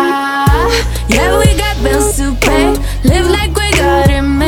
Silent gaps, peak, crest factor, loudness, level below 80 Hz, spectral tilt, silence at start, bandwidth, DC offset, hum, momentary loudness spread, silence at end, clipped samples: none; 0 dBFS; 10 dB; -11 LUFS; -16 dBFS; -5 dB/octave; 0 s; 18.5 kHz; under 0.1%; none; 3 LU; 0 s; under 0.1%